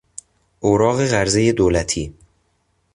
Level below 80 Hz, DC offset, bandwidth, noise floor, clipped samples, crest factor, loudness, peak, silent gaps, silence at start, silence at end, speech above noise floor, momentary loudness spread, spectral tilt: -38 dBFS; under 0.1%; 11.5 kHz; -65 dBFS; under 0.1%; 16 dB; -18 LUFS; -2 dBFS; none; 0.6 s; 0.85 s; 48 dB; 17 LU; -5 dB/octave